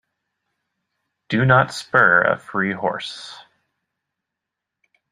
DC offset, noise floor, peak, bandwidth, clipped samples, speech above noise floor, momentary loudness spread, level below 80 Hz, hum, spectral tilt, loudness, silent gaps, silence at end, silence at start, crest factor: under 0.1%; -83 dBFS; -2 dBFS; 11 kHz; under 0.1%; 65 dB; 17 LU; -58 dBFS; none; -6 dB/octave; -18 LUFS; none; 1.7 s; 1.3 s; 20 dB